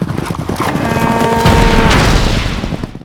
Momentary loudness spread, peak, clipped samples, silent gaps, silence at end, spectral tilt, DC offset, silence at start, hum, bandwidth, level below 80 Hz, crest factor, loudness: 10 LU; 0 dBFS; 0.4%; none; 0 s; -5.5 dB/octave; under 0.1%; 0 s; none; 18 kHz; -18 dBFS; 12 dB; -12 LUFS